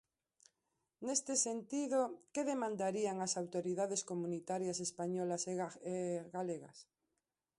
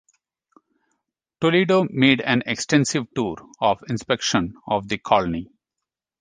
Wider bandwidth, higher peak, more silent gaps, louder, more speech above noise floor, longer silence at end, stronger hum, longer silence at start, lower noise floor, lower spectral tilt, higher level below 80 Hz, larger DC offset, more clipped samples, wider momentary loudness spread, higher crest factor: first, 11.5 kHz vs 10 kHz; second, -20 dBFS vs -2 dBFS; neither; second, -39 LUFS vs -21 LUFS; second, 50 dB vs 64 dB; about the same, 0.75 s vs 0.75 s; neither; second, 1 s vs 1.4 s; first, -89 dBFS vs -85 dBFS; about the same, -4 dB/octave vs -4.5 dB/octave; second, -84 dBFS vs -54 dBFS; neither; neither; about the same, 7 LU vs 9 LU; about the same, 20 dB vs 20 dB